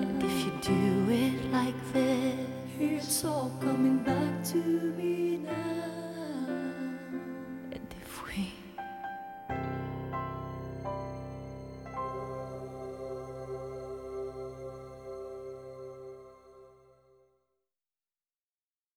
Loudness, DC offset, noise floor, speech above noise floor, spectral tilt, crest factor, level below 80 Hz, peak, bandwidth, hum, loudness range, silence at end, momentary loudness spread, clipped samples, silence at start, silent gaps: -34 LUFS; under 0.1%; under -90 dBFS; over 60 dB; -5.5 dB/octave; 18 dB; -58 dBFS; -16 dBFS; 17.5 kHz; none; 15 LU; 2.2 s; 15 LU; under 0.1%; 0 s; none